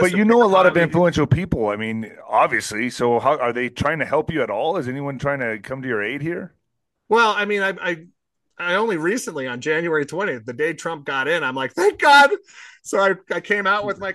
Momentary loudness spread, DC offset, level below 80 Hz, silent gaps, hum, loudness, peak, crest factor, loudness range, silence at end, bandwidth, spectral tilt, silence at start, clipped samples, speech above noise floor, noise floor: 12 LU; under 0.1%; -50 dBFS; none; none; -19 LUFS; -2 dBFS; 18 dB; 5 LU; 0 s; 12.5 kHz; -5 dB/octave; 0 s; under 0.1%; 57 dB; -77 dBFS